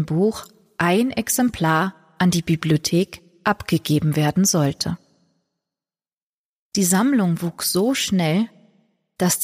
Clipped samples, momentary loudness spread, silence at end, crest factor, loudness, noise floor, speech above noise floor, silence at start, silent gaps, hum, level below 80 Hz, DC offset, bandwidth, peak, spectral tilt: under 0.1%; 9 LU; 0 s; 16 dB; -20 LUFS; under -90 dBFS; over 71 dB; 0 s; 6.17-6.72 s; none; -54 dBFS; under 0.1%; 15.5 kHz; -6 dBFS; -4.5 dB/octave